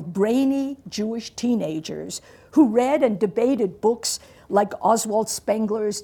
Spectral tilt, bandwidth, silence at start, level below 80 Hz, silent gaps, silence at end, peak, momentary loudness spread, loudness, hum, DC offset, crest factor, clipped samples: -4.5 dB/octave; 19 kHz; 0 s; -60 dBFS; none; 0 s; -6 dBFS; 11 LU; -22 LUFS; none; under 0.1%; 16 dB; under 0.1%